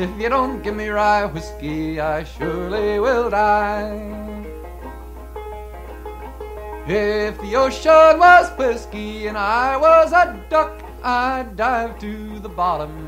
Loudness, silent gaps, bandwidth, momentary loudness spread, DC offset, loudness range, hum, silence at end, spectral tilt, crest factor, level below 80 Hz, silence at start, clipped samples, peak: -17 LUFS; none; 16 kHz; 22 LU; under 0.1%; 12 LU; none; 0 s; -5.5 dB/octave; 18 dB; -36 dBFS; 0 s; under 0.1%; 0 dBFS